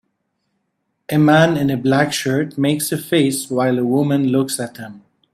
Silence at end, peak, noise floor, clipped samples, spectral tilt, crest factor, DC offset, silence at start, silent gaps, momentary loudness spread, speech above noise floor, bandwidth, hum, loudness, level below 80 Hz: 0.35 s; 0 dBFS; -71 dBFS; under 0.1%; -5.5 dB/octave; 18 dB; under 0.1%; 1.1 s; none; 9 LU; 55 dB; 15.5 kHz; none; -17 LUFS; -56 dBFS